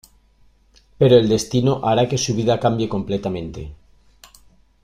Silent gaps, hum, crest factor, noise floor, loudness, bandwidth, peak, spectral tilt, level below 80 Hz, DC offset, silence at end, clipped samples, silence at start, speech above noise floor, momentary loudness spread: none; none; 18 dB; -55 dBFS; -18 LUFS; 15 kHz; -2 dBFS; -6 dB/octave; -46 dBFS; under 0.1%; 1.1 s; under 0.1%; 1 s; 37 dB; 15 LU